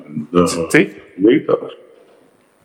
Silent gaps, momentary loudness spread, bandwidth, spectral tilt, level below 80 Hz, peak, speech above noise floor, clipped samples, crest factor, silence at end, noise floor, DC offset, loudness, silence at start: none; 8 LU; 15.5 kHz; -5.5 dB/octave; -54 dBFS; 0 dBFS; 38 dB; under 0.1%; 18 dB; 0.9 s; -52 dBFS; under 0.1%; -16 LUFS; 0 s